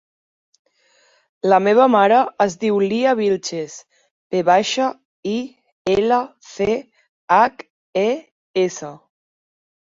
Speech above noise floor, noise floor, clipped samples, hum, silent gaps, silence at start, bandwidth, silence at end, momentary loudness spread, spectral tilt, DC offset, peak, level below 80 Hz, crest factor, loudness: 41 dB; -58 dBFS; under 0.1%; none; 4.11-4.30 s, 5.05-5.23 s, 5.72-5.85 s, 7.09-7.28 s, 7.70-7.93 s, 8.31-8.54 s; 1.45 s; 7.8 kHz; 0.85 s; 15 LU; -4.5 dB/octave; under 0.1%; -2 dBFS; -58 dBFS; 18 dB; -18 LUFS